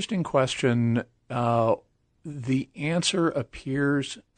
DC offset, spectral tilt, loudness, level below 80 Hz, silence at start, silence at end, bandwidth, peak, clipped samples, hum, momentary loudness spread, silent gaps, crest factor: under 0.1%; -5.5 dB/octave; -26 LUFS; -58 dBFS; 0 s; 0.15 s; 9.4 kHz; -8 dBFS; under 0.1%; none; 9 LU; none; 18 dB